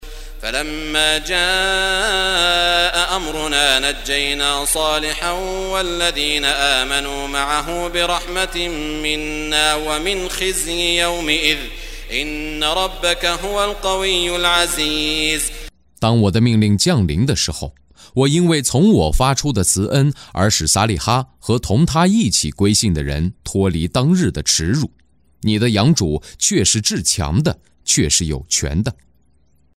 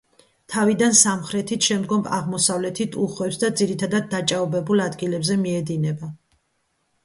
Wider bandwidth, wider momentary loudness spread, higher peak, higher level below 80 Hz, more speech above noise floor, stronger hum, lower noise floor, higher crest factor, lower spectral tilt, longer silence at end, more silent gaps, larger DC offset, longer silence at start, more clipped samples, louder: first, 16 kHz vs 11.5 kHz; about the same, 8 LU vs 10 LU; about the same, 0 dBFS vs -2 dBFS; first, -32 dBFS vs -62 dBFS; second, 41 dB vs 49 dB; neither; second, -58 dBFS vs -70 dBFS; about the same, 18 dB vs 20 dB; about the same, -3.5 dB/octave vs -3.5 dB/octave; about the same, 0.85 s vs 0.9 s; neither; neither; second, 0 s vs 0.5 s; neither; first, -17 LUFS vs -21 LUFS